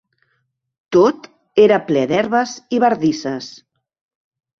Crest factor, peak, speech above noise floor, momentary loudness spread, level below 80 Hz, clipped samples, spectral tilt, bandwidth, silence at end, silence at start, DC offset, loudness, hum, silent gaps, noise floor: 18 dB; 0 dBFS; 53 dB; 13 LU; -60 dBFS; under 0.1%; -5.5 dB/octave; 7.2 kHz; 1.1 s; 0.9 s; under 0.1%; -16 LUFS; none; none; -69 dBFS